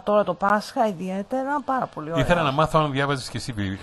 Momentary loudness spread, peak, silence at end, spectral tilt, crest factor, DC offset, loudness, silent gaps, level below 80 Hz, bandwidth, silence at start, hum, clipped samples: 8 LU; -4 dBFS; 0 s; -6 dB/octave; 18 dB; under 0.1%; -23 LUFS; none; -44 dBFS; 12.5 kHz; 0.05 s; none; under 0.1%